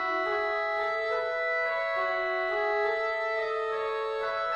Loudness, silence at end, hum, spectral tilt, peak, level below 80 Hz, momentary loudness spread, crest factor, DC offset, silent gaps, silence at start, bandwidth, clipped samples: -29 LUFS; 0 s; none; -3 dB/octave; -16 dBFS; -64 dBFS; 3 LU; 12 dB; under 0.1%; none; 0 s; 9.4 kHz; under 0.1%